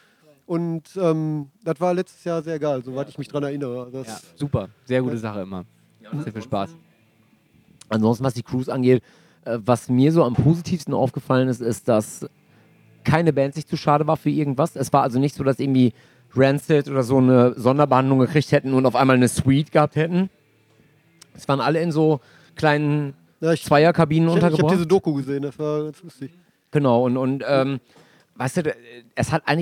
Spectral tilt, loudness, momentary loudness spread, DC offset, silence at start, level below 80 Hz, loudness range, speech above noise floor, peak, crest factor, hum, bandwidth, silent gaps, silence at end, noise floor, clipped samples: -7 dB/octave; -21 LUFS; 14 LU; under 0.1%; 0.5 s; -58 dBFS; 9 LU; 39 dB; -2 dBFS; 20 dB; none; 15 kHz; none; 0 s; -59 dBFS; under 0.1%